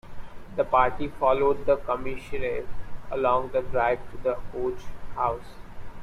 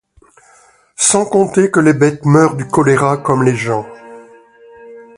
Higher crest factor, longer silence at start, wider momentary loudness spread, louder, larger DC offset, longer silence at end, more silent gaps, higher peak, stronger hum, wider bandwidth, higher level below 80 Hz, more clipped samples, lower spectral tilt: about the same, 18 dB vs 14 dB; second, 0.05 s vs 1 s; first, 19 LU vs 7 LU; second, -27 LUFS vs -13 LUFS; neither; second, 0 s vs 0.15 s; neither; second, -8 dBFS vs 0 dBFS; neither; second, 10 kHz vs 11.5 kHz; first, -42 dBFS vs -50 dBFS; neither; first, -7 dB/octave vs -5 dB/octave